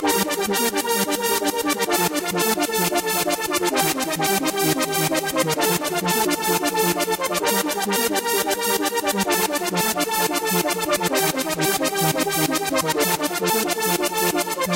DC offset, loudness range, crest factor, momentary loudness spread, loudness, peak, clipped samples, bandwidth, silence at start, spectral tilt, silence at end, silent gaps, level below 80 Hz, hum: under 0.1%; 0 LU; 14 dB; 2 LU; -20 LUFS; -8 dBFS; under 0.1%; 16 kHz; 0 s; -2.5 dB/octave; 0 s; none; -56 dBFS; none